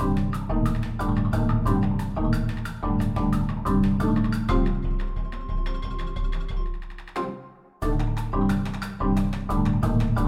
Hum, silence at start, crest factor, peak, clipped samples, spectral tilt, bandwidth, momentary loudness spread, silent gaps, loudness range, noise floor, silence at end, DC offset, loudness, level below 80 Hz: none; 0 s; 16 dB; -8 dBFS; under 0.1%; -8.5 dB/octave; 12 kHz; 10 LU; none; 7 LU; -44 dBFS; 0 s; under 0.1%; -26 LUFS; -28 dBFS